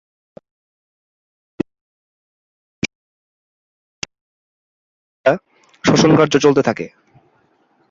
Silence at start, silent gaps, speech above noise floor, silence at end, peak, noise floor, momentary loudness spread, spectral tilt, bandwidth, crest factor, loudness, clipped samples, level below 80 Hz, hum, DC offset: 1.6 s; 1.81-2.82 s, 2.95-4.02 s, 4.21-5.24 s; 46 dB; 1.05 s; 0 dBFS; -59 dBFS; 19 LU; -5.5 dB/octave; 7.6 kHz; 20 dB; -17 LUFS; under 0.1%; -54 dBFS; none; under 0.1%